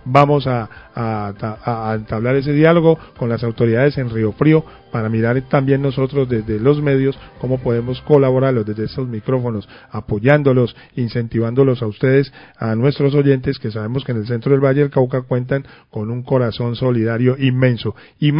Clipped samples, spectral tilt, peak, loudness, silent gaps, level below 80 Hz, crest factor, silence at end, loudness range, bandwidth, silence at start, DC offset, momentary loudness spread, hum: under 0.1%; -10 dB/octave; 0 dBFS; -17 LUFS; none; -44 dBFS; 16 dB; 0 s; 2 LU; 5.4 kHz; 0.05 s; under 0.1%; 11 LU; none